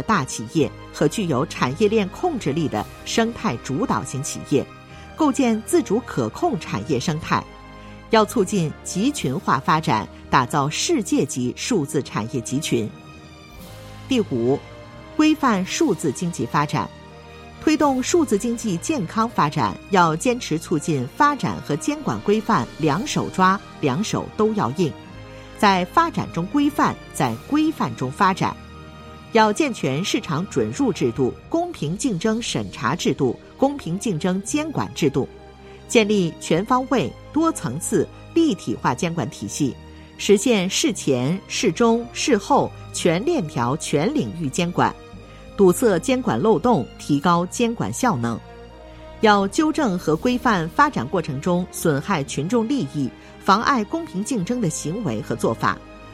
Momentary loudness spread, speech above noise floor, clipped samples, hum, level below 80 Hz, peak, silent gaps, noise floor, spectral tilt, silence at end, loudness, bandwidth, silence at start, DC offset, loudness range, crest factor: 9 LU; 21 dB; under 0.1%; none; -48 dBFS; -2 dBFS; none; -42 dBFS; -5 dB/octave; 0 s; -21 LUFS; 16 kHz; 0 s; under 0.1%; 3 LU; 20 dB